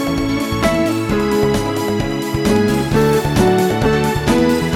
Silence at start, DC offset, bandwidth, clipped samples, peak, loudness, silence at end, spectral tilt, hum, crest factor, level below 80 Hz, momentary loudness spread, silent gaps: 0 s; under 0.1%; 17.5 kHz; under 0.1%; -2 dBFS; -16 LUFS; 0 s; -6 dB/octave; none; 14 dB; -32 dBFS; 4 LU; none